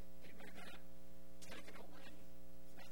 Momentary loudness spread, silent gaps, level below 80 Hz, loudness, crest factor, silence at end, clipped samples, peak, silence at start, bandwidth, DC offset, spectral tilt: 7 LU; none; -68 dBFS; -59 LUFS; 16 dB; 0 s; under 0.1%; -36 dBFS; 0 s; over 20 kHz; 0.8%; -4 dB/octave